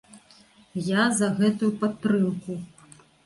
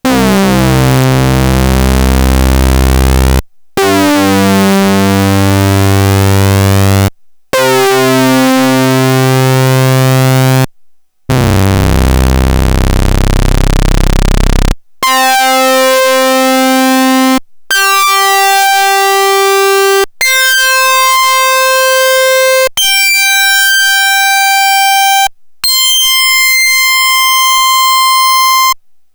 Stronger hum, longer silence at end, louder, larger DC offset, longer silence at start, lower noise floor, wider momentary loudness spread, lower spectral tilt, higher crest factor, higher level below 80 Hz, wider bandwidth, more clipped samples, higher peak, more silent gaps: neither; first, 0.6 s vs 0.4 s; second, -24 LUFS vs -8 LUFS; neither; about the same, 0.15 s vs 0.05 s; first, -55 dBFS vs -41 dBFS; first, 14 LU vs 6 LU; about the same, -5 dB/octave vs -4 dB/octave; first, 16 dB vs 8 dB; second, -64 dBFS vs -16 dBFS; second, 11.5 kHz vs over 20 kHz; neither; second, -10 dBFS vs 0 dBFS; neither